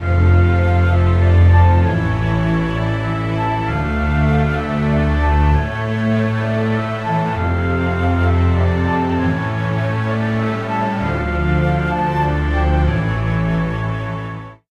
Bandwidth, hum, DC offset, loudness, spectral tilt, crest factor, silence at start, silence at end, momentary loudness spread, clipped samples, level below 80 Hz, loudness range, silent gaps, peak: 6.6 kHz; none; under 0.1%; -17 LUFS; -8.5 dB/octave; 14 dB; 0 s; 0.15 s; 6 LU; under 0.1%; -24 dBFS; 3 LU; none; -2 dBFS